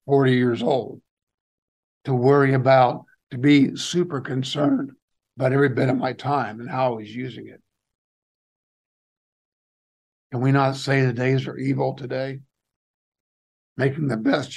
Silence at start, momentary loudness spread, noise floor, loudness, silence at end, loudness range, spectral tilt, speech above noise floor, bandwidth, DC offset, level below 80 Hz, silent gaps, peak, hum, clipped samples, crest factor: 0.05 s; 16 LU; under -90 dBFS; -21 LUFS; 0 s; 10 LU; -7 dB/octave; over 69 dB; 10 kHz; under 0.1%; -68 dBFS; 1.11-1.17 s, 1.23-1.27 s, 1.34-2.01 s, 5.02-5.08 s, 7.95-10.30 s, 12.76-13.12 s, 13.20-13.76 s; -4 dBFS; none; under 0.1%; 18 dB